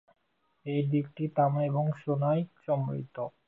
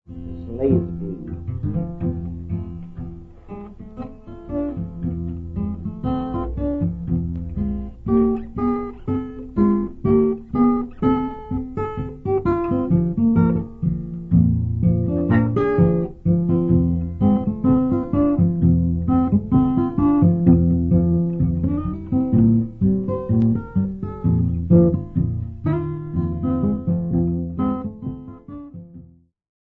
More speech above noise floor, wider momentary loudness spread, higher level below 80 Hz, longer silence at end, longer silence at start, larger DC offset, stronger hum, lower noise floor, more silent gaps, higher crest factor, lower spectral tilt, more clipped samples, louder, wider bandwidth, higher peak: first, 37 dB vs 25 dB; second, 8 LU vs 13 LU; second, -72 dBFS vs -36 dBFS; second, 0.2 s vs 0.6 s; first, 0.65 s vs 0.1 s; neither; neither; first, -66 dBFS vs -48 dBFS; neither; about the same, 16 dB vs 18 dB; second, -11 dB/octave vs -12.5 dB/octave; neither; second, -30 LUFS vs -21 LUFS; first, 4 kHz vs 3.3 kHz; second, -14 dBFS vs -2 dBFS